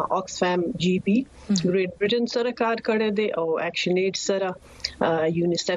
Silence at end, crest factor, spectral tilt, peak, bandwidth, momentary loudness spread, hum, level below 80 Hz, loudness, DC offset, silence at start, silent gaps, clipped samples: 0 s; 18 dB; -5 dB/octave; -6 dBFS; 10.5 kHz; 3 LU; none; -56 dBFS; -24 LUFS; under 0.1%; 0 s; none; under 0.1%